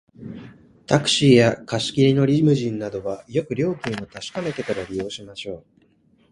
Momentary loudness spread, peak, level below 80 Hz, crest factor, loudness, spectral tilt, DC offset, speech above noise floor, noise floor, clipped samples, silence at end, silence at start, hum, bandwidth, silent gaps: 19 LU; 0 dBFS; -54 dBFS; 20 dB; -21 LUFS; -5.5 dB/octave; under 0.1%; 38 dB; -59 dBFS; under 0.1%; 0.75 s; 0.2 s; none; 11.5 kHz; none